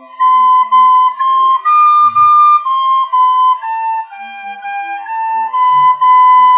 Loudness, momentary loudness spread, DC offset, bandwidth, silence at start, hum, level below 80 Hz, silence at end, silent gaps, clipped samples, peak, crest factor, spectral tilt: -9 LUFS; 14 LU; under 0.1%; 3.8 kHz; 0.2 s; none; -80 dBFS; 0 s; none; under 0.1%; -2 dBFS; 8 dB; -4 dB/octave